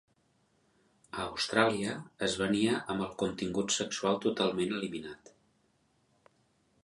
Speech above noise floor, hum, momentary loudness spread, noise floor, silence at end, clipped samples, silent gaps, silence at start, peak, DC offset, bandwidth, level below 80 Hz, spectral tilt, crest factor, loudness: 40 dB; none; 11 LU; -72 dBFS; 1.7 s; under 0.1%; none; 1.15 s; -10 dBFS; under 0.1%; 11.5 kHz; -64 dBFS; -4 dB/octave; 24 dB; -32 LUFS